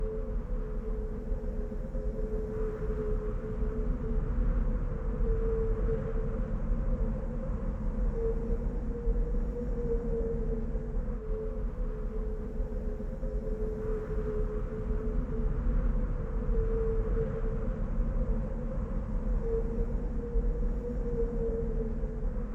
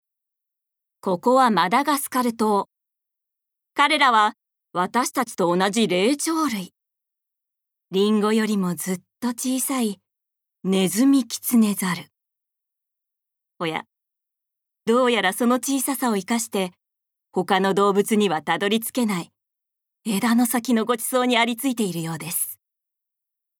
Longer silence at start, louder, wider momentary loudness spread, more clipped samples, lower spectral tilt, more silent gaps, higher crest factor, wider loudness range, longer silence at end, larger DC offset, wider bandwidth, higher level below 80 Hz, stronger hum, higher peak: second, 0 s vs 1.05 s; second, -35 LUFS vs -22 LUFS; second, 5 LU vs 11 LU; neither; first, -10.5 dB/octave vs -4 dB/octave; neither; second, 12 dB vs 20 dB; about the same, 3 LU vs 4 LU; second, 0 s vs 1.05 s; neither; second, 2.7 kHz vs 20 kHz; first, -32 dBFS vs -78 dBFS; neither; second, -18 dBFS vs -4 dBFS